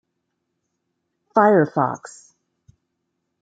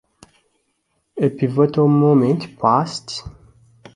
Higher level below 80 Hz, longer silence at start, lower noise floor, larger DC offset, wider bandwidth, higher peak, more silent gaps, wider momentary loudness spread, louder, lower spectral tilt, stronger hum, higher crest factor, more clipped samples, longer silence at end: second, -72 dBFS vs -52 dBFS; first, 1.35 s vs 1.15 s; first, -76 dBFS vs -69 dBFS; neither; second, 9.2 kHz vs 11 kHz; about the same, -2 dBFS vs -2 dBFS; neither; second, 10 LU vs 15 LU; about the same, -18 LUFS vs -17 LUFS; about the same, -7.5 dB/octave vs -7.5 dB/octave; neither; about the same, 22 dB vs 18 dB; neither; first, 1.35 s vs 0.65 s